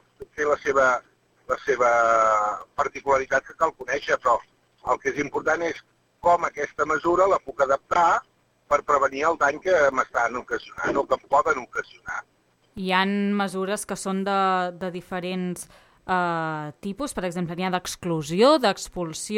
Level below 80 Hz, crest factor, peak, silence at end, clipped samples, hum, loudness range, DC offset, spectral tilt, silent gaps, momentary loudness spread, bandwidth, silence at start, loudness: -56 dBFS; 18 dB; -6 dBFS; 0 s; under 0.1%; none; 4 LU; under 0.1%; -4.5 dB/octave; none; 12 LU; 15.5 kHz; 0.2 s; -24 LUFS